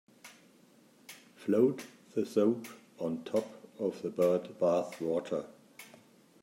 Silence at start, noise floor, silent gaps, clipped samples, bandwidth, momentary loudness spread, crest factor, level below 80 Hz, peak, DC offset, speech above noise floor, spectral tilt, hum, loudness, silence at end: 0.25 s; -62 dBFS; none; under 0.1%; 16 kHz; 23 LU; 20 dB; -80 dBFS; -14 dBFS; under 0.1%; 31 dB; -6.5 dB/octave; none; -33 LUFS; 0.55 s